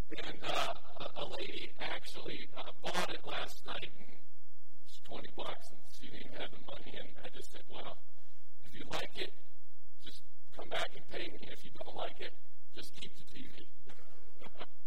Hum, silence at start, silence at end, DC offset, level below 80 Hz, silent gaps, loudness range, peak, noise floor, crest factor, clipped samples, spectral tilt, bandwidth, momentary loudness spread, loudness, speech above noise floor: none; 0.1 s; 0.2 s; 6%; -66 dBFS; none; 8 LU; -18 dBFS; -72 dBFS; 28 dB; under 0.1%; -4 dB/octave; 16.5 kHz; 19 LU; -44 LUFS; 26 dB